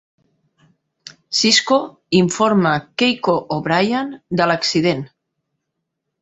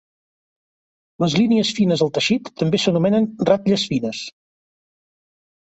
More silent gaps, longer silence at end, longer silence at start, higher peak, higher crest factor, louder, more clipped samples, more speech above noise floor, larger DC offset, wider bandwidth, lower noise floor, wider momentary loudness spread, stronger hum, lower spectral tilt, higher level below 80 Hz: neither; second, 1.15 s vs 1.3 s; second, 1.05 s vs 1.2 s; about the same, -2 dBFS vs -4 dBFS; about the same, 18 dB vs 18 dB; about the same, -17 LUFS vs -19 LUFS; neither; second, 60 dB vs over 72 dB; neither; about the same, 8.2 kHz vs 8.2 kHz; second, -77 dBFS vs under -90 dBFS; about the same, 8 LU vs 7 LU; neither; second, -4 dB/octave vs -5.5 dB/octave; about the same, -58 dBFS vs -58 dBFS